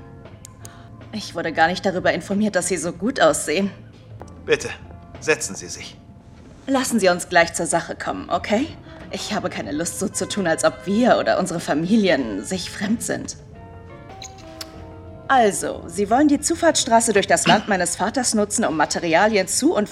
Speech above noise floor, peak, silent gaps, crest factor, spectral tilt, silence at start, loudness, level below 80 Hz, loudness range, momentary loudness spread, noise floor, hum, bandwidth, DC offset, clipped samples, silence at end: 23 dB; -2 dBFS; none; 20 dB; -3.5 dB/octave; 0 s; -20 LUFS; -50 dBFS; 7 LU; 20 LU; -43 dBFS; none; 15.5 kHz; under 0.1%; under 0.1%; 0 s